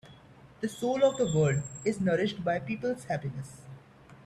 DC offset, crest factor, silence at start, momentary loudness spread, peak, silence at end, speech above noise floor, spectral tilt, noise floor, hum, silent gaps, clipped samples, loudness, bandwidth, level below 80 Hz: under 0.1%; 18 dB; 0.05 s; 15 LU; -12 dBFS; 0.1 s; 25 dB; -6 dB/octave; -54 dBFS; none; none; under 0.1%; -30 LUFS; 13 kHz; -60 dBFS